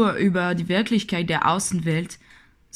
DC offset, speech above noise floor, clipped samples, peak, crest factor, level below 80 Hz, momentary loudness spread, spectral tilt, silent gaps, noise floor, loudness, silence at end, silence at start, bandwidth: under 0.1%; 30 dB; under 0.1%; -6 dBFS; 18 dB; -54 dBFS; 6 LU; -5 dB/octave; none; -52 dBFS; -22 LUFS; 0.6 s; 0 s; 14.5 kHz